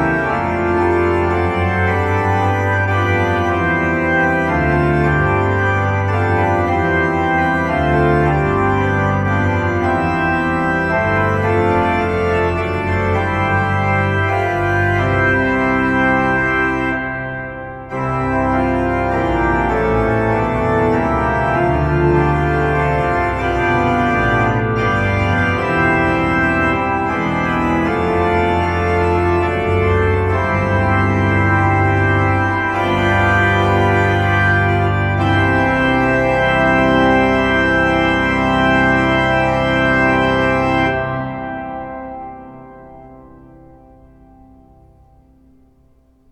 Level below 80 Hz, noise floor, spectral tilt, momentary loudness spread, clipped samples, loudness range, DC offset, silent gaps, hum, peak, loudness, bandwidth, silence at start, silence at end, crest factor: -32 dBFS; -52 dBFS; -7.5 dB/octave; 4 LU; under 0.1%; 3 LU; under 0.1%; none; none; -2 dBFS; -15 LUFS; 8.4 kHz; 0 s; 3.05 s; 14 dB